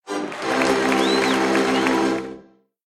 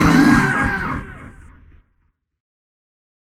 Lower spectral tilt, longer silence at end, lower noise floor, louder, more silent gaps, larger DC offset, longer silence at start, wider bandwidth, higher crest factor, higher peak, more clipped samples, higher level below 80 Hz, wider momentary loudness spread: second, -4 dB/octave vs -6 dB/octave; second, 0.45 s vs 2.05 s; second, -48 dBFS vs -66 dBFS; second, -20 LUFS vs -16 LUFS; neither; neither; about the same, 0.05 s vs 0 s; about the same, 14.5 kHz vs 15.5 kHz; about the same, 16 dB vs 20 dB; second, -6 dBFS vs 0 dBFS; neither; second, -54 dBFS vs -36 dBFS; second, 9 LU vs 24 LU